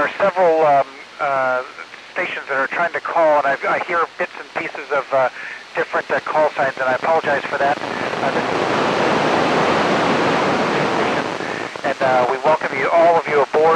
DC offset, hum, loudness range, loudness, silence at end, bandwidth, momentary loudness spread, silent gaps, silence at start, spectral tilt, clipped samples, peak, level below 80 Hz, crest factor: under 0.1%; none; 3 LU; -18 LUFS; 0 s; 10.5 kHz; 9 LU; none; 0 s; -4.5 dB/octave; under 0.1%; -4 dBFS; -58 dBFS; 14 dB